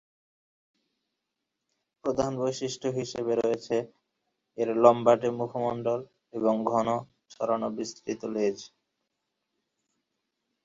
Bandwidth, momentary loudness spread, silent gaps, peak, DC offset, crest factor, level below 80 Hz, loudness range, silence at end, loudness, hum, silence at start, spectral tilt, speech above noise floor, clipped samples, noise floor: 7.8 kHz; 13 LU; none; -4 dBFS; under 0.1%; 26 dB; -68 dBFS; 8 LU; 1.95 s; -28 LUFS; none; 2.05 s; -6 dB/octave; 57 dB; under 0.1%; -84 dBFS